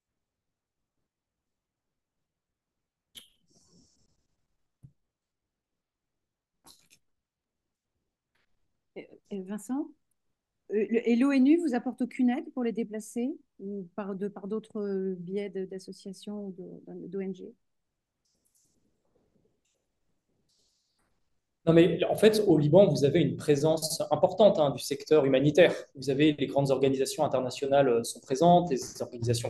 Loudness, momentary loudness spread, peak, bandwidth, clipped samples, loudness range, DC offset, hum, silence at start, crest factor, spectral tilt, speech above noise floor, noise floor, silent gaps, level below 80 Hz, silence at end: -27 LUFS; 17 LU; -8 dBFS; 12.5 kHz; under 0.1%; 18 LU; under 0.1%; none; 8.95 s; 22 dB; -6 dB/octave; 61 dB; -87 dBFS; none; -66 dBFS; 0 s